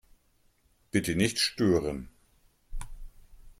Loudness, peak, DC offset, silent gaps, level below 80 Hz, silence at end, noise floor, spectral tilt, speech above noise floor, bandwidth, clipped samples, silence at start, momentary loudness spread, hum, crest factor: -28 LUFS; -10 dBFS; under 0.1%; none; -46 dBFS; 0.1 s; -67 dBFS; -4.5 dB/octave; 40 dB; 16 kHz; under 0.1%; 0.95 s; 23 LU; none; 22 dB